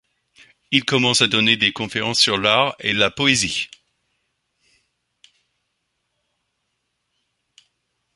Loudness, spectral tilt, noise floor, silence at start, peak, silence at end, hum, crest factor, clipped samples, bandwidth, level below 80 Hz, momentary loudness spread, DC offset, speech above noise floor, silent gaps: -17 LUFS; -2.5 dB/octave; -74 dBFS; 0.7 s; 0 dBFS; 4.5 s; none; 24 dB; under 0.1%; 11.5 kHz; -56 dBFS; 7 LU; under 0.1%; 55 dB; none